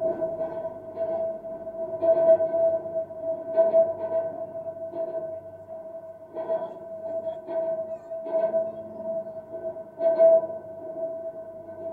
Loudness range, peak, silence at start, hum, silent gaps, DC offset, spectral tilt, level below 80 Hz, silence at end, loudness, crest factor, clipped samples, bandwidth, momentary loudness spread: 9 LU; -10 dBFS; 0 s; none; none; under 0.1%; -9 dB/octave; -70 dBFS; 0 s; -27 LUFS; 18 dB; under 0.1%; 3.5 kHz; 17 LU